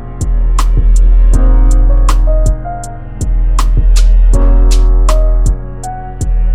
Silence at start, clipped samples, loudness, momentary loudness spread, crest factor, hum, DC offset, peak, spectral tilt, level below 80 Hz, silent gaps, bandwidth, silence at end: 0 s; under 0.1%; -13 LUFS; 10 LU; 8 dB; none; 4%; 0 dBFS; -6 dB/octave; -8 dBFS; none; 10 kHz; 0 s